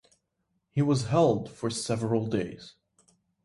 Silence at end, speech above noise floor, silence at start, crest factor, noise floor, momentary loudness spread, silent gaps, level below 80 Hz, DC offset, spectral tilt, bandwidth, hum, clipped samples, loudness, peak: 0.75 s; 51 dB; 0.75 s; 18 dB; -78 dBFS; 10 LU; none; -62 dBFS; under 0.1%; -6.5 dB/octave; 11.5 kHz; none; under 0.1%; -28 LUFS; -10 dBFS